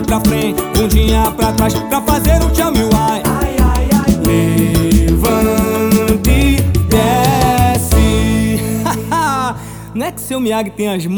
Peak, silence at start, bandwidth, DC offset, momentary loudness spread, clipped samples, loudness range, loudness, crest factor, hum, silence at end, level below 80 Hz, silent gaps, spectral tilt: 0 dBFS; 0 s; over 20 kHz; under 0.1%; 6 LU; under 0.1%; 2 LU; -13 LUFS; 12 dB; none; 0 s; -18 dBFS; none; -5.5 dB/octave